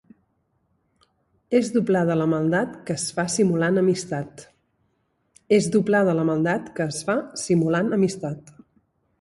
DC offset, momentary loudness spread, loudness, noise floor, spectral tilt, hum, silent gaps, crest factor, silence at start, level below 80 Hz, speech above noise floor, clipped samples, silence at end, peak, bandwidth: under 0.1%; 9 LU; -22 LUFS; -70 dBFS; -5.5 dB/octave; none; none; 18 dB; 1.5 s; -62 dBFS; 48 dB; under 0.1%; 0.8 s; -6 dBFS; 11.5 kHz